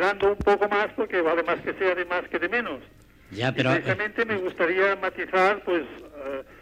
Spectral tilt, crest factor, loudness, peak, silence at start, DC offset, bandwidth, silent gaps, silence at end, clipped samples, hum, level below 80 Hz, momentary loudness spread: -6 dB/octave; 16 dB; -25 LUFS; -8 dBFS; 0 s; under 0.1%; 13 kHz; none; 0.05 s; under 0.1%; none; -52 dBFS; 13 LU